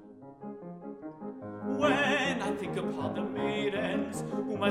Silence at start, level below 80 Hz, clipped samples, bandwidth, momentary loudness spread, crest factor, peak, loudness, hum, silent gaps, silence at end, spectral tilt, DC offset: 0 s; -64 dBFS; under 0.1%; 13.5 kHz; 17 LU; 18 dB; -14 dBFS; -31 LUFS; none; none; 0 s; -5 dB/octave; under 0.1%